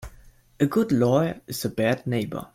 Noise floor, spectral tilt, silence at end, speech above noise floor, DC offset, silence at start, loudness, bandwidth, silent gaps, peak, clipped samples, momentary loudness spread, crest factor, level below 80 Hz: -52 dBFS; -6.5 dB/octave; 0.1 s; 28 dB; under 0.1%; 0 s; -24 LUFS; 16.5 kHz; none; -8 dBFS; under 0.1%; 8 LU; 16 dB; -52 dBFS